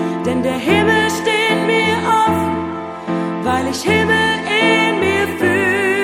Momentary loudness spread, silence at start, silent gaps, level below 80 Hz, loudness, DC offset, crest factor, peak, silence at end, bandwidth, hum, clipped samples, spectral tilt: 7 LU; 0 s; none; -46 dBFS; -15 LUFS; under 0.1%; 14 dB; -2 dBFS; 0 s; 16.5 kHz; none; under 0.1%; -4.5 dB/octave